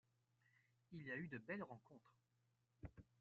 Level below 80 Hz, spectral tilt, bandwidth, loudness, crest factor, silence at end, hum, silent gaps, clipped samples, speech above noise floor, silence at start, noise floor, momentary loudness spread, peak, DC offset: -76 dBFS; -6 dB/octave; 7.2 kHz; -54 LUFS; 20 dB; 0.2 s; none; none; under 0.1%; 31 dB; 0.9 s; -85 dBFS; 12 LU; -36 dBFS; under 0.1%